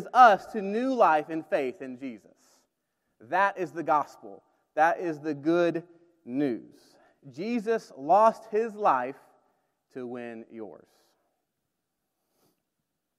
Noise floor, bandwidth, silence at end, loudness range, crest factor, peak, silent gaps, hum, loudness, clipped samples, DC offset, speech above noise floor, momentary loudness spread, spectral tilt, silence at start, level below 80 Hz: -82 dBFS; 13 kHz; 2.45 s; 17 LU; 24 dB; -6 dBFS; none; none; -26 LUFS; under 0.1%; under 0.1%; 56 dB; 19 LU; -6 dB/octave; 0 s; -82 dBFS